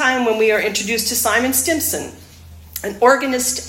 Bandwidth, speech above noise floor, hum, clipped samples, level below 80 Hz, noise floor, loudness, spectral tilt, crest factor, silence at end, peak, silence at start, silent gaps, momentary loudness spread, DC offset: 17 kHz; 22 dB; none; under 0.1%; -50 dBFS; -40 dBFS; -16 LUFS; -2 dB/octave; 18 dB; 0 s; 0 dBFS; 0 s; none; 13 LU; under 0.1%